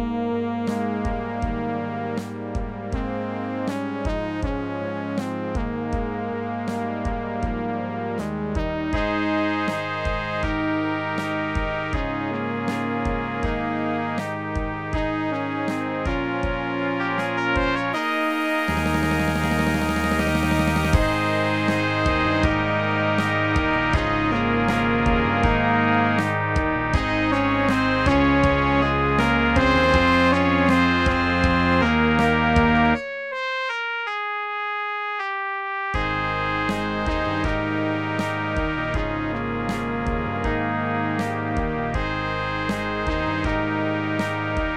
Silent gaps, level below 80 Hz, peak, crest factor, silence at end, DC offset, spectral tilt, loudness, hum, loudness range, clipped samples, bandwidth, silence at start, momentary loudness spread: none; -34 dBFS; -4 dBFS; 18 dB; 0 s; 0.3%; -6.5 dB/octave; -23 LUFS; none; 9 LU; under 0.1%; 16 kHz; 0 s; 9 LU